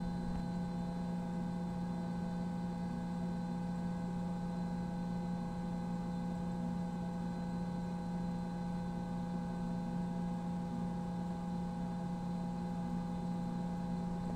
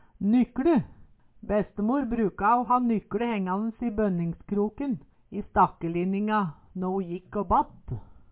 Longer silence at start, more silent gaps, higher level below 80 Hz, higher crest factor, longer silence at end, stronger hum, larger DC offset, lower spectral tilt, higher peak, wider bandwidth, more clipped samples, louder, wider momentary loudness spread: second, 0 s vs 0.2 s; neither; about the same, -54 dBFS vs -50 dBFS; second, 10 dB vs 18 dB; second, 0 s vs 0.2 s; neither; neither; about the same, -8 dB/octave vs -7.5 dB/octave; second, -28 dBFS vs -10 dBFS; first, 9.2 kHz vs 4 kHz; neither; second, -40 LUFS vs -27 LUFS; second, 1 LU vs 11 LU